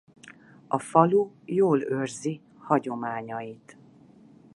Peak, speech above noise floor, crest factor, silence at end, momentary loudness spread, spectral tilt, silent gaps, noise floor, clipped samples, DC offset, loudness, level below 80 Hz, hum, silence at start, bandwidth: -4 dBFS; 28 dB; 24 dB; 0.85 s; 15 LU; -7 dB/octave; none; -54 dBFS; under 0.1%; under 0.1%; -26 LUFS; -74 dBFS; none; 0.25 s; 11.5 kHz